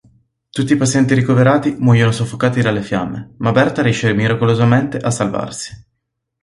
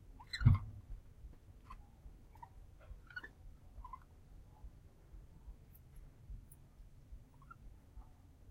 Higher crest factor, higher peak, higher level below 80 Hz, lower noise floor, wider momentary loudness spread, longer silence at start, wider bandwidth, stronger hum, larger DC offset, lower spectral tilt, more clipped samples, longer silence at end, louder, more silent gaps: second, 14 dB vs 28 dB; first, 0 dBFS vs -16 dBFS; first, -46 dBFS vs -52 dBFS; first, -74 dBFS vs -59 dBFS; second, 10 LU vs 24 LU; first, 0.55 s vs 0 s; second, 11.5 kHz vs 16 kHz; neither; neither; about the same, -6 dB/octave vs -7 dB/octave; neither; first, 0.65 s vs 0 s; first, -15 LUFS vs -39 LUFS; neither